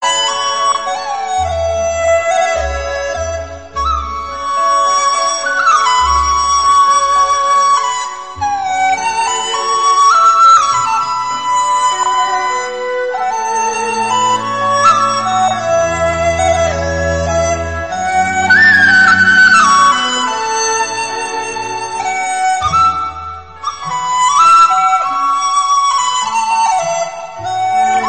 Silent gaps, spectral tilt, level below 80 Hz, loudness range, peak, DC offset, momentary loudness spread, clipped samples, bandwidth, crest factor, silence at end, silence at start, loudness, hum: none; -2 dB/octave; -34 dBFS; 7 LU; 0 dBFS; 0.6%; 12 LU; under 0.1%; 8.8 kHz; 12 dB; 0 s; 0 s; -12 LUFS; none